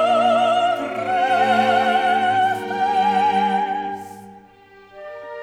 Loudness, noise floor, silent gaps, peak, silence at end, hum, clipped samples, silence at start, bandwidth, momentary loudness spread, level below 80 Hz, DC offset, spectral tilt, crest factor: -18 LUFS; -47 dBFS; none; -6 dBFS; 0 s; none; under 0.1%; 0 s; 13.5 kHz; 17 LU; -66 dBFS; under 0.1%; -4.5 dB/octave; 14 dB